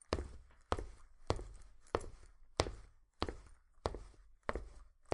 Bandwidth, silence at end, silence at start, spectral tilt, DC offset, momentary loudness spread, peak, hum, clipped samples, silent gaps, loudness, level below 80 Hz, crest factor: 11 kHz; 0 s; 0.1 s; -4.5 dB/octave; under 0.1%; 22 LU; -8 dBFS; none; under 0.1%; none; -44 LUFS; -52 dBFS; 36 dB